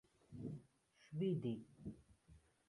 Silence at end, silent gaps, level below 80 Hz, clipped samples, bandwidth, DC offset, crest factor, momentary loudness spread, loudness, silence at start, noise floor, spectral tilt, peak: 0.3 s; none; -74 dBFS; under 0.1%; 11 kHz; under 0.1%; 18 dB; 17 LU; -47 LUFS; 0.3 s; -73 dBFS; -9 dB/octave; -30 dBFS